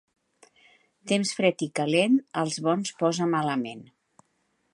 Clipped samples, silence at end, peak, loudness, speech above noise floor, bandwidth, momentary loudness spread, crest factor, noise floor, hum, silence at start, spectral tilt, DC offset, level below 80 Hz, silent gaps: under 0.1%; 0.9 s; -8 dBFS; -26 LUFS; 47 dB; 11.5 kHz; 9 LU; 20 dB; -72 dBFS; none; 1.05 s; -4.5 dB/octave; under 0.1%; -76 dBFS; none